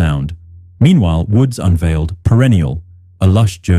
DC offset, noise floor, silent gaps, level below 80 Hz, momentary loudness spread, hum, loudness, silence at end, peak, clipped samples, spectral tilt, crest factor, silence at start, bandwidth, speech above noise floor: under 0.1%; -32 dBFS; none; -26 dBFS; 10 LU; none; -13 LUFS; 0 s; -2 dBFS; under 0.1%; -7.5 dB/octave; 12 dB; 0 s; 13.5 kHz; 21 dB